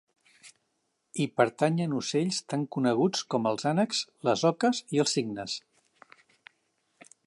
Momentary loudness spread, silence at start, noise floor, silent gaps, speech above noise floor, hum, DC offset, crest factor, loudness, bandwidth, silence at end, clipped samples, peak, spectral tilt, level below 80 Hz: 8 LU; 0.45 s; -77 dBFS; none; 50 dB; none; under 0.1%; 22 dB; -28 LUFS; 11.5 kHz; 1.65 s; under 0.1%; -8 dBFS; -5 dB/octave; -76 dBFS